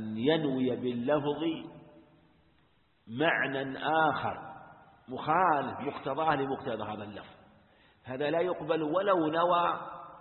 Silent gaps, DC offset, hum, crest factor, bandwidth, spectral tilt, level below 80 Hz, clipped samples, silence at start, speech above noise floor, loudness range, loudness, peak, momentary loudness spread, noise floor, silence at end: none; under 0.1%; none; 20 dB; 4.3 kHz; -9.5 dB/octave; -68 dBFS; under 0.1%; 0 s; 39 dB; 3 LU; -30 LUFS; -12 dBFS; 16 LU; -69 dBFS; 0 s